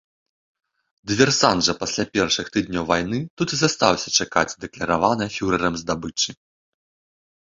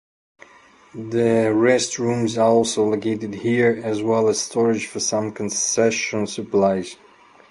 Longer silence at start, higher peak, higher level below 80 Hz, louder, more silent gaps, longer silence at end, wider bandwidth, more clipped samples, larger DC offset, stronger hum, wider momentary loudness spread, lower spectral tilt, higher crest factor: about the same, 1.05 s vs 0.95 s; about the same, -2 dBFS vs -2 dBFS; first, -50 dBFS vs -60 dBFS; about the same, -21 LUFS vs -20 LUFS; first, 3.30-3.37 s vs none; first, 1.15 s vs 0.55 s; second, 7.8 kHz vs 11.5 kHz; neither; neither; neither; about the same, 9 LU vs 8 LU; about the same, -3.5 dB/octave vs -4 dB/octave; about the same, 22 dB vs 18 dB